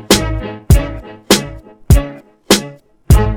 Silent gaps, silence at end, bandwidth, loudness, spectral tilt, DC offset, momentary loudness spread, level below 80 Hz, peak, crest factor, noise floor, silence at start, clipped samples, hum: none; 0 s; 19.5 kHz; -14 LUFS; -4.5 dB/octave; under 0.1%; 16 LU; -18 dBFS; 0 dBFS; 14 dB; -33 dBFS; 0.1 s; under 0.1%; none